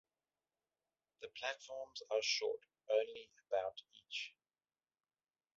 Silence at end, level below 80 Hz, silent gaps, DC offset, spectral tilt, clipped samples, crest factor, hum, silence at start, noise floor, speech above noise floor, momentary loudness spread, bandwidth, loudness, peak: 1.3 s; -88 dBFS; none; under 0.1%; 3 dB/octave; under 0.1%; 22 dB; none; 1.2 s; under -90 dBFS; over 48 dB; 16 LU; 7.6 kHz; -41 LUFS; -22 dBFS